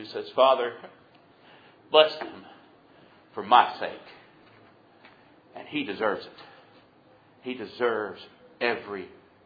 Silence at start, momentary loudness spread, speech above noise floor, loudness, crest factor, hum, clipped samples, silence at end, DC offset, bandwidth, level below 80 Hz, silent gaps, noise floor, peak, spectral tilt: 0 s; 25 LU; 32 dB; -26 LUFS; 26 dB; none; under 0.1%; 0.35 s; under 0.1%; 5 kHz; -78 dBFS; none; -58 dBFS; -2 dBFS; -5.5 dB/octave